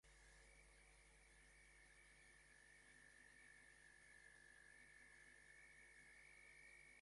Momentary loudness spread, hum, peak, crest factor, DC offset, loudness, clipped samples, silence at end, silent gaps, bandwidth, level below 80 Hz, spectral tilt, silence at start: 4 LU; none; -56 dBFS; 14 dB; under 0.1%; -67 LUFS; under 0.1%; 0 s; none; 11.5 kHz; -78 dBFS; -2 dB/octave; 0.05 s